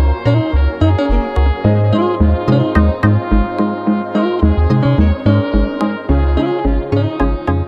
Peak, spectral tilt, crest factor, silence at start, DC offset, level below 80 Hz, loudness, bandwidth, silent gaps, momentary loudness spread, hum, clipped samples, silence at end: 0 dBFS; -9.5 dB/octave; 12 dB; 0 s; under 0.1%; -18 dBFS; -14 LUFS; 5.4 kHz; none; 4 LU; none; under 0.1%; 0 s